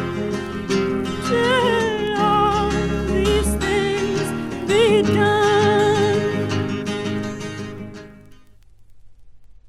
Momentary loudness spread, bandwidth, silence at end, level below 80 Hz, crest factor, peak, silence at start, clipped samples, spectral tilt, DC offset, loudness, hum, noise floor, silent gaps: 11 LU; 14.5 kHz; 0 s; -36 dBFS; 14 dB; -6 dBFS; 0 s; under 0.1%; -5 dB/octave; under 0.1%; -19 LUFS; none; -46 dBFS; none